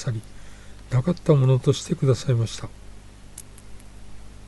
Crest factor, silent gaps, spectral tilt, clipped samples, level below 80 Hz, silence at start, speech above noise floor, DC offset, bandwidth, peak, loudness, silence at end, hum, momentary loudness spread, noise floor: 18 dB; none; -7 dB/octave; under 0.1%; -46 dBFS; 0 s; 21 dB; under 0.1%; 11.5 kHz; -6 dBFS; -22 LUFS; 0 s; 50 Hz at -45 dBFS; 24 LU; -42 dBFS